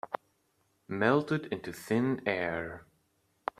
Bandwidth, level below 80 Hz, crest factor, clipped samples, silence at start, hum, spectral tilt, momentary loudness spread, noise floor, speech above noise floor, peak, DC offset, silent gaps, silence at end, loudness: 15 kHz; -68 dBFS; 22 dB; under 0.1%; 0.05 s; none; -6.5 dB/octave; 14 LU; -74 dBFS; 43 dB; -10 dBFS; under 0.1%; none; 0.75 s; -32 LUFS